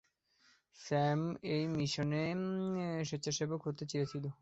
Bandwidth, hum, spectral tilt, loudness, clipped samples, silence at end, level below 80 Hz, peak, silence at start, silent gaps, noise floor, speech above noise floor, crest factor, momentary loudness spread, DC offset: 8 kHz; none; -5.5 dB/octave; -37 LUFS; under 0.1%; 0.1 s; -70 dBFS; -22 dBFS; 0.75 s; none; -72 dBFS; 35 dB; 16 dB; 5 LU; under 0.1%